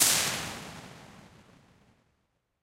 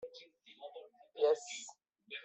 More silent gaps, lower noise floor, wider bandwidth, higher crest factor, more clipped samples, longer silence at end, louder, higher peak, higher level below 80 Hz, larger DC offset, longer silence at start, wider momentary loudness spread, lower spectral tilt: neither; first, -76 dBFS vs -59 dBFS; first, 16 kHz vs 8.4 kHz; first, 26 dB vs 20 dB; neither; first, 1.35 s vs 0 s; first, -28 LUFS vs -36 LUFS; first, -8 dBFS vs -20 dBFS; first, -62 dBFS vs under -90 dBFS; neither; about the same, 0 s vs 0 s; first, 26 LU vs 22 LU; about the same, -0.5 dB/octave vs 0 dB/octave